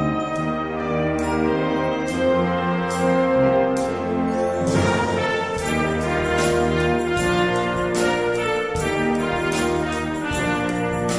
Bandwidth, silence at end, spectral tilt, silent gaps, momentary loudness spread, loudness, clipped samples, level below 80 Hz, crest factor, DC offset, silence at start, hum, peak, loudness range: 11 kHz; 0 s; -5.5 dB/octave; none; 4 LU; -21 LUFS; under 0.1%; -40 dBFS; 14 dB; 0.2%; 0 s; none; -8 dBFS; 1 LU